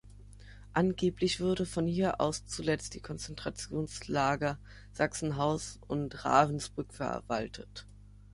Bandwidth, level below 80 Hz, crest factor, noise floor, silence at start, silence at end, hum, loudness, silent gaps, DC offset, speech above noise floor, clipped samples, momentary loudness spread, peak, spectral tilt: 11.5 kHz; -52 dBFS; 24 dB; -51 dBFS; 0.05 s; 0.3 s; 50 Hz at -50 dBFS; -33 LUFS; none; under 0.1%; 19 dB; under 0.1%; 12 LU; -10 dBFS; -5 dB/octave